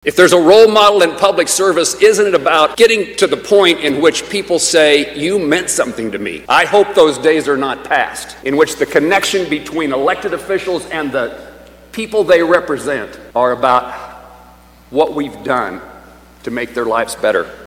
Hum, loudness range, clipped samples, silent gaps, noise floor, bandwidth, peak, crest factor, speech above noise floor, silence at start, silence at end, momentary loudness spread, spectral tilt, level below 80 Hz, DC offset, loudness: none; 7 LU; 0.3%; none; -42 dBFS; 16.5 kHz; 0 dBFS; 14 dB; 29 dB; 0.05 s; 0 s; 12 LU; -3 dB/octave; -48 dBFS; under 0.1%; -13 LUFS